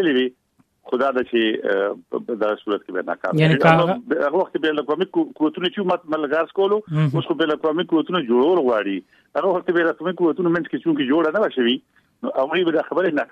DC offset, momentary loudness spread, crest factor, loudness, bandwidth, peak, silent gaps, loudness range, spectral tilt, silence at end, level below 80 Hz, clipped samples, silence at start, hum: under 0.1%; 8 LU; 20 dB; -20 LUFS; 7.6 kHz; 0 dBFS; none; 2 LU; -8 dB/octave; 0.05 s; -64 dBFS; under 0.1%; 0 s; none